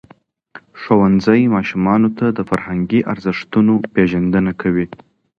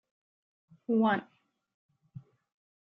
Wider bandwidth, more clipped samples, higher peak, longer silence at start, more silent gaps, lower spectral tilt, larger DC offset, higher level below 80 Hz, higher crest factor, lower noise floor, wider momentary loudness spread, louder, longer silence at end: first, 6.8 kHz vs 4.1 kHz; neither; first, 0 dBFS vs -16 dBFS; second, 0.55 s vs 0.9 s; second, none vs 1.74-1.89 s; about the same, -8.5 dB/octave vs -9.5 dB/octave; neither; first, -44 dBFS vs -80 dBFS; about the same, 16 dB vs 20 dB; about the same, -50 dBFS vs -53 dBFS; second, 8 LU vs 25 LU; first, -16 LUFS vs -29 LUFS; second, 0.45 s vs 0.7 s